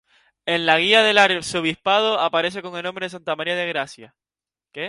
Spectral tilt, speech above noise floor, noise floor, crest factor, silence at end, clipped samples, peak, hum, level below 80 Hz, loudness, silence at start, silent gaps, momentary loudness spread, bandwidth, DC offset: -3 dB/octave; over 70 dB; under -90 dBFS; 20 dB; 0 s; under 0.1%; 0 dBFS; none; -64 dBFS; -19 LUFS; 0.45 s; none; 15 LU; 11.5 kHz; under 0.1%